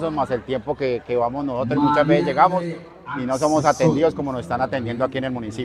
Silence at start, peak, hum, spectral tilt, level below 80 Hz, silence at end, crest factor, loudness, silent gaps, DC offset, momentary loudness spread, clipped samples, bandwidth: 0 s; -2 dBFS; none; -6.5 dB/octave; -50 dBFS; 0 s; 18 dB; -21 LUFS; none; under 0.1%; 10 LU; under 0.1%; 12.5 kHz